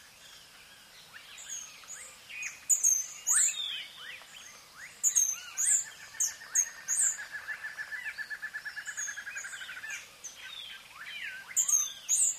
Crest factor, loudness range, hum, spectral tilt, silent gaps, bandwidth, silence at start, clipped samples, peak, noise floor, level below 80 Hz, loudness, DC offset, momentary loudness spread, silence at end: 22 dB; 10 LU; none; 3.5 dB/octave; none; 15.5 kHz; 0 s; under 0.1%; -12 dBFS; -54 dBFS; -76 dBFS; -30 LUFS; under 0.1%; 21 LU; 0 s